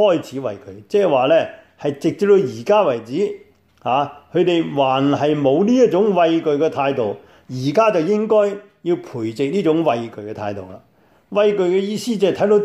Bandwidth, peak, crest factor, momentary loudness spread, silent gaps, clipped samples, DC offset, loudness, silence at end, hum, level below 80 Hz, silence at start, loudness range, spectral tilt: 12.5 kHz; -4 dBFS; 14 dB; 12 LU; none; under 0.1%; under 0.1%; -18 LUFS; 0 s; none; -64 dBFS; 0 s; 4 LU; -6.5 dB/octave